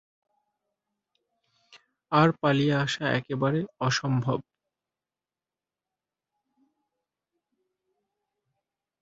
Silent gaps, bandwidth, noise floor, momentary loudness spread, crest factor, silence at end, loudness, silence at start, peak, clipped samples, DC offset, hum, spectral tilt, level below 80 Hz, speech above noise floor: none; 7.8 kHz; under -90 dBFS; 6 LU; 24 dB; 4.6 s; -26 LUFS; 2.1 s; -6 dBFS; under 0.1%; under 0.1%; none; -6 dB/octave; -66 dBFS; over 65 dB